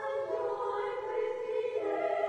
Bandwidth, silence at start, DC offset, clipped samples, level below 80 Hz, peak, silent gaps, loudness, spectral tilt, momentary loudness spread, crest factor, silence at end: 9.4 kHz; 0 s; under 0.1%; under 0.1%; -72 dBFS; -20 dBFS; none; -34 LUFS; -5 dB/octave; 2 LU; 14 dB; 0 s